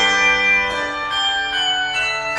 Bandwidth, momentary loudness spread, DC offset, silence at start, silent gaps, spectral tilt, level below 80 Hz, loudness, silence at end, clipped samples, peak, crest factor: 12 kHz; 7 LU; under 0.1%; 0 s; none; -0.5 dB/octave; -46 dBFS; -16 LUFS; 0 s; under 0.1%; -4 dBFS; 14 dB